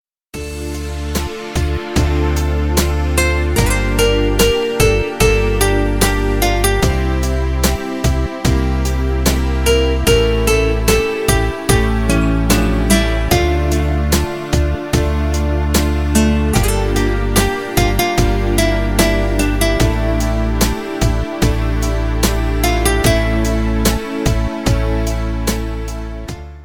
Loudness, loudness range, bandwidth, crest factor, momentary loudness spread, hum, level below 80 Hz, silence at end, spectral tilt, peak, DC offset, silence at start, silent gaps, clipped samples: -16 LUFS; 2 LU; 19.5 kHz; 14 dB; 6 LU; none; -18 dBFS; 0 s; -5 dB/octave; 0 dBFS; under 0.1%; 0.35 s; none; under 0.1%